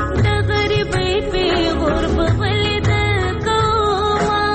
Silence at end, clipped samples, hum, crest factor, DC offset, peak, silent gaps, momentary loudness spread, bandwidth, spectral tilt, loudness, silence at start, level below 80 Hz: 0 s; under 0.1%; none; 10 dB; under 0.1%; -6 dBFS; none; 2 LU; 8.8 kHz; -6 dB/octave; -17 LUFS; 0 s; -26 dBFS